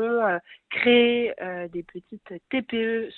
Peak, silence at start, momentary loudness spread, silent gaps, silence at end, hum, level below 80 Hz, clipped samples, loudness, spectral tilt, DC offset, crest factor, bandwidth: -8 dBFS; 0 s; 23 LU; none; 0 s; none; -64 dBFS; under 0.1%; -24 LUFS; -8 dB/octave; under 0.1%; 18 dB; 4.3 kHz